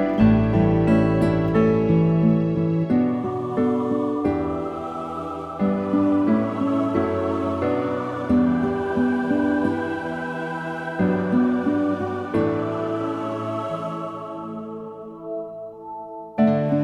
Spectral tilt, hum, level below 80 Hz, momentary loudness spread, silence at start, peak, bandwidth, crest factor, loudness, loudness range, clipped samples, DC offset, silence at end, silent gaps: -9.5 dB/octave; none; -44 dBFS; 14 LU; 0 s; -4 dBFS; 8.8 kHz; 18 dB; -22 LUFS; 7 LU; under 0.1%; under 0.1%; 0 s; none